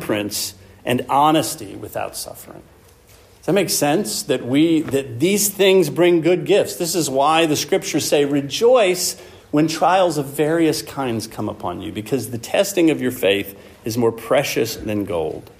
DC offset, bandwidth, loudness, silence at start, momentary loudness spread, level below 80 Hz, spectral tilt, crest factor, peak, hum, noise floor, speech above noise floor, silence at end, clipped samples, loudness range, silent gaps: under 0.1%; 15.5 kHz; -18 LUFS; 0 s; 12 LU; -54 dBFS; -4 dB/octave; 16 dB; -4 dBFS; none; -48 dBFS; 30 dB; 0.15 s; under 0.1%; 5 LU; none